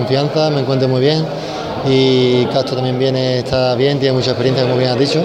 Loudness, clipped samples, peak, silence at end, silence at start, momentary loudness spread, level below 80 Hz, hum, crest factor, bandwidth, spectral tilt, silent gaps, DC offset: -15 LUFS; under 0.1%; 0 dBFS; 0 s; 0 s; 5 LU; -46 dBFS; none; 14 dB; 9.8 kHz; -6.5 dB/octave; none; under 0.1%